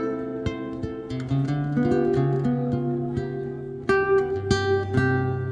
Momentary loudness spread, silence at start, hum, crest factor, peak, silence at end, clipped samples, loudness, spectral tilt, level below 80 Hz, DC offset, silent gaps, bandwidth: 10 LU; 0 s; none; 18 dB; -6 dBFS; 0 s; under 0.1%; -25 LUFS; -7.5 dB/octave; -46 dBFS; under 0.1%; none; 9.8 kHz